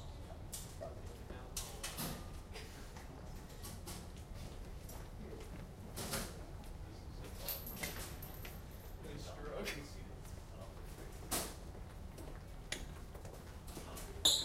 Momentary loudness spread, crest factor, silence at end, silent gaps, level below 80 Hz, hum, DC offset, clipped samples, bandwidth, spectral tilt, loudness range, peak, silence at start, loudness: 10 LU; 28 dB; 0 s; none; -52 dBFS; none; under 0.1%; under 0.1%; 16 kHz; -2.5 dB/octave; 3 LU; -18 dBFS; 0 s; -46 LUFS